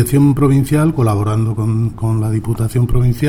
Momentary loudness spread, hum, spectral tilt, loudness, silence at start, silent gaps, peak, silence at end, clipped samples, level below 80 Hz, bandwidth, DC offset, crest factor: 6 LU; none; -8 dB/octave; -15 LUFS; 0 s; none; -2 dBFS; 0 s; under 0.1%; -28 dBFS; 16.5 kHz; under 0.1%; 12 dB